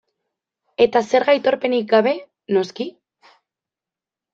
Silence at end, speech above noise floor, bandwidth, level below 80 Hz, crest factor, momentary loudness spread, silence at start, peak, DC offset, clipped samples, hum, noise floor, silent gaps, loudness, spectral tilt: 1.45 s; 71 dB; 7.6 kHz; -66 dBFS; 18 dB; 13 LU; 0.8 s; -2 dBFS; under 0.1%; under 0.1%; none; -89 dBFS; none; -18 LUFS; -5 dB/octave